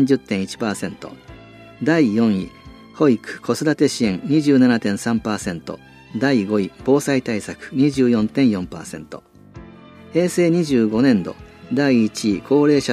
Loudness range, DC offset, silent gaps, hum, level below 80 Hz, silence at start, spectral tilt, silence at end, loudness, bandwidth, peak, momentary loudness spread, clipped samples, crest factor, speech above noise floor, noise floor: 3 LU; under 0.1%; none; none; -52 dBFS; 0 s; -6 dB/octave; 0 s; -19 LUFS; 14.5 kHz; -2 dBFS; 16 LU; under 0.1%; 16 dB; 24 dB; -42 dBFS